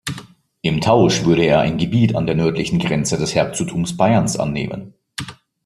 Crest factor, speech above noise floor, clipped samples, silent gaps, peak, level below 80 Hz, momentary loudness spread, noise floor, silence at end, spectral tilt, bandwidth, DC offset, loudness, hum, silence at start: 16 dB; 23 dB; under 0.1%; none; 0 dBFS; -46 dBFS; 16 LU; -40 dBFS; 0.3 s; -5.5 dB/octave; 13 kHz; under 0.1%; -17 LUFS; none; 0.05 s